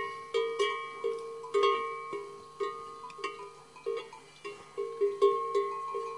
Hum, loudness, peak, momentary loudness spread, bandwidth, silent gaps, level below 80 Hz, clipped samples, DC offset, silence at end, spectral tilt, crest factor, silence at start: none; -33 LUFS; -14 dBFS; 17 LU; 11.5 kHz; none; -78 dBFS; under 0.1%; under 0.1%; 0 s; -3 dB/octave; 20 dB; 0 s